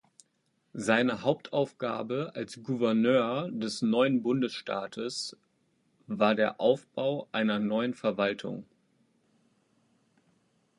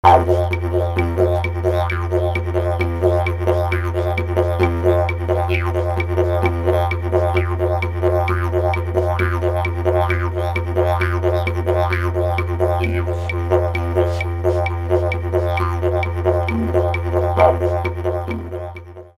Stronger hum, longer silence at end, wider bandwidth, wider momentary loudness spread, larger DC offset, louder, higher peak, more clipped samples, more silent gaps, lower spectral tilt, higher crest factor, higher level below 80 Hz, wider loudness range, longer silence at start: neither; first, 2.15 s vs 0.1 s; second, 11.5 kHz vs 13 kHz; first, 11 LU vs 3 LU; neither; second, -29 LUFS vs -19 LUFS; second, -8 dBFS vs 0 dBFS; neither; neither; second, -5.5 dB/octave vs -8 dB/octave; about the same, 22 dB vs 18 dB; second, -74 dBFS vs -30 dBFS; first, 4 LU vs 1 LU; first, 0.75 s vs 0.05 s